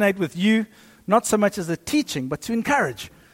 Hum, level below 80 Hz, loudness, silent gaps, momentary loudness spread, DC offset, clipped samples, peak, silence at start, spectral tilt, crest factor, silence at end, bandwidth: none; -56 dBFS; -22 LUFS; none; 9 LU; under 0.1%; under 0.1%; -6 dBFS; 0 s; -4.5 dB/octave; 18 dB; 0.25 s; 16.5 kHz